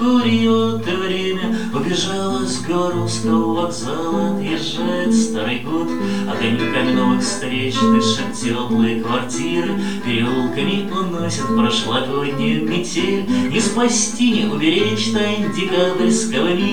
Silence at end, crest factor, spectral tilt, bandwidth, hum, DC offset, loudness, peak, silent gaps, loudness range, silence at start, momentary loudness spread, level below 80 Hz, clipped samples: 0 s; 14 dB; -4.5 dB/octave; 17 kHz; none; 3%; -18 LUFS; -4 dBFS; none; 3 LU; 0 s; 5 LU; -50 dBFS; under 0.1%